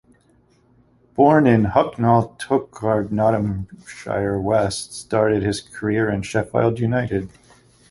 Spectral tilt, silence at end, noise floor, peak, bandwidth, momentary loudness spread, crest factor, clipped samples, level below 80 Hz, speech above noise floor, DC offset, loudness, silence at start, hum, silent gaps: -6.5 dB/octave; 0.65 s; -58 dBFS; -2 dBFS; 11.5 kHz; 12 LU; 18 dB; under 0.1%; -46 dBFS; 38 dB; under 0.1%; -20 LUFS; 1.15 s; none; none